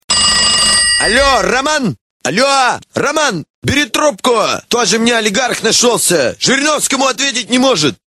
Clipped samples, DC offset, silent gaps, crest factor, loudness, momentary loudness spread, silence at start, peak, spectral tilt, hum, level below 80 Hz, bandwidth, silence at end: under 0.1%; 0.1%; 2.01-2.20 s, 3.50-3.62 s; 12 dB; -11 LUFS; 7 LU; 0.1 s; 0 dBFS; -2 dB/octave; none; -38 dBFS; 16 kHz; 0.2 s